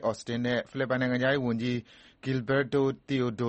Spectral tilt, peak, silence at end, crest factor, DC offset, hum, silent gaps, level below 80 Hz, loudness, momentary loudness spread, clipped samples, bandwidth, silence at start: -6.5 dB/octave; -14 dBFS; 0 s; 16 dB; under 0.1%; none; none; -62 dBFS; -29 LUFS; 6 LU; under 0.1%; 8.4 kHz; 0 s